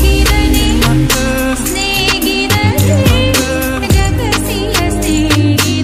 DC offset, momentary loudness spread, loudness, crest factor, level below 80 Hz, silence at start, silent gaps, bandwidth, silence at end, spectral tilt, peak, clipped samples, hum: under 0.1%; 4 LU; -12 LUFS; 12 dB; -18 dBFS; 0 s; none; 16 kHz; 0 s; -4.5 dB/octave; 0 dBFS; under 0.1%; none